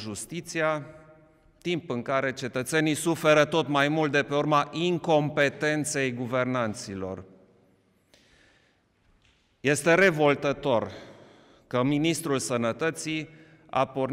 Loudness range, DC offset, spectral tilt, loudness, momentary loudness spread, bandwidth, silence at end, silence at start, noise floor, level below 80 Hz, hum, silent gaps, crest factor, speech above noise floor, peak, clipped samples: 8 LU; under 0.1%; -4.5 dB/octave; -26 LUFS; 13 LU; 16 kHz; 0 s; 0 s; -66 dBFS; -64 dBFS; none; none; 18 dB; 40 dB; -10 dBFS; under 0.1%